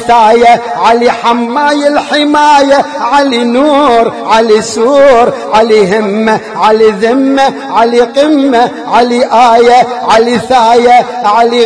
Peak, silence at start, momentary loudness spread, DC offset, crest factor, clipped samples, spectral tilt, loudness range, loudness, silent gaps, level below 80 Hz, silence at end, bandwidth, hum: 0 dBFS; 0 s; 5 LU; 0.2%; 6 dB; 3%; -4 dB/octave; 1 LU; -7 LUFS; none; -44 dBFS; 0 s; 11 kHz; none